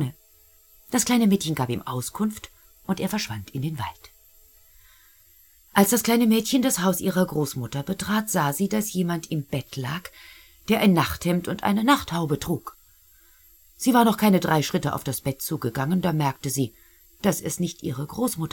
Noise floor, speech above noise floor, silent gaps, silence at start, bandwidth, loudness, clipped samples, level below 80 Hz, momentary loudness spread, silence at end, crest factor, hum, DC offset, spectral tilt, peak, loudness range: -56 dBFS; 33 dB; none; 0 s; 17.5 kHz; -24 LUFS; under 0.1%; -54 dBFS; 12 LU; 0.05 s; 22 dB; none; under 0.1%; -5 dB/octave; -2 dBFS; 5 LU